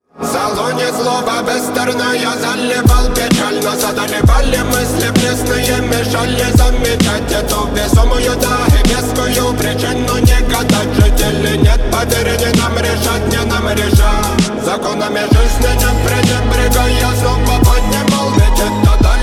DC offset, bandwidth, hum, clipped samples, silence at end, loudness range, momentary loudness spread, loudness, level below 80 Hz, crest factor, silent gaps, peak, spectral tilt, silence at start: under 0.1%; 17.5 kHz; none; under 0.1%; 0 s; 1 LU; 4 LU; -13 LUFS; -16 dBFS; 12 dB; none; 0 dBFS; -4.5 dB/octave; 0.15 s